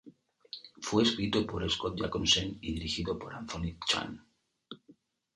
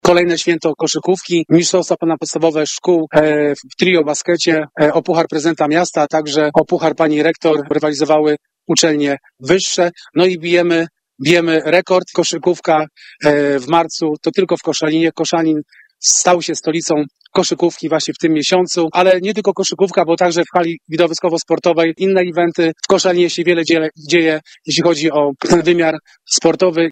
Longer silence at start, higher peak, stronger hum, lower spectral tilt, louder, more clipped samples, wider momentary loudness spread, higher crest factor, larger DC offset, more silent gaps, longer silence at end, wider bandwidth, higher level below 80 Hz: about the same, 0.05 s vs 0.05 s; second, -12 dBFS vs 0 dBFS; neither; about the same, -3.5 dB/octave vs -4 dB/octave; second, -31 LUFS vs -14 LUFS; neither; first, 22 LU vs 5 LU; first, 22 dB vs 14 dB; neither; neither; first, 0.45 s vs 0 s; first, 11.5 kHz vs 9.2 kHz; about the same, -52 dBFS vs -54 dBFS